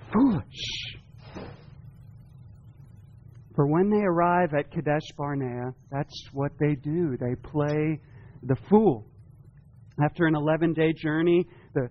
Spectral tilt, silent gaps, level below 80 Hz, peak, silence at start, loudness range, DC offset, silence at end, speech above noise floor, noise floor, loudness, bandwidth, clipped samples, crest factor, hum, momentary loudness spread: -6 dB/octave; none; -54 dBFS; -6 dBFS; 0.05 s; 6 LU; under 0.1%; 0 s; 27 dB; -51 dBFS; -26 LUFS; 6.8 kHz; under 0.1%; 20 dB; none; 16 LU